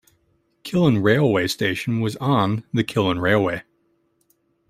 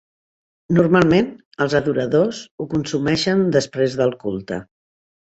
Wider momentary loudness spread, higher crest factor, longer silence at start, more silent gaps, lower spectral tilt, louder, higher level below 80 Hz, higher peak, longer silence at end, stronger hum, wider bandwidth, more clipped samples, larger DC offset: second, 8 LU vs 13 LU; about the same, 20 dB vs 18 dB; about the same, 0.65 s vs 0.7 s; second, none vs 1.45-1.51 s, 2.51-2.58 s; about the same, -6.5 dB/octave vs -6 dB/octave; about the same, -20 LUFS vs -19 LUFS; about the same, -54 dBFS vs -50 dBFS; about the same, -2 dBFS vs -2 dBFS; first, 1.1 s vs 0.7 s; neither; first, 16 kHz vs 8.2 kHz; neither; neither